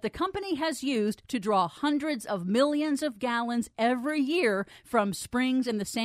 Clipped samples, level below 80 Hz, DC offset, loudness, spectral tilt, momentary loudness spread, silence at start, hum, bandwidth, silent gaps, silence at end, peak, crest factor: under 0.1%; -62 dBFS; under 0.1%; -28 LUFS; -4.5 dB/octave; 5 LU; 0.05 s; none; 15.5 kHz; none; 0 s; -12 dBFS; 16 dB